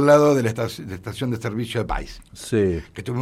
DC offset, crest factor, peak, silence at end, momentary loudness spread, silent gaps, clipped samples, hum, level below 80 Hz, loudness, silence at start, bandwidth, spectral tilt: under 0.1%; 18 dB; -4 dBFS; 0 s; 16 LU; none; under 0.1%; none; -40 dBFS; -23 LUFS; 0 s; 15.5 kHz; -6.5 dB/octave